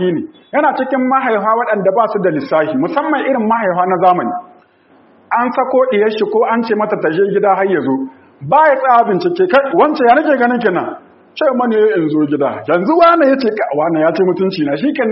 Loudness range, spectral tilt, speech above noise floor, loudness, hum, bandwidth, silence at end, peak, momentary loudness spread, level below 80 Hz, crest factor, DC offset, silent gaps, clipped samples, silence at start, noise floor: 3 LU; -4.5 dB/octave; 36 dB; -13 LUFS; none; 6 kHz; 0 s; 0 dBFS; 7 LU; -62 dBFS; 14 dB; under 0.1%; none; under 0.1%; 0 s; -48 dBFS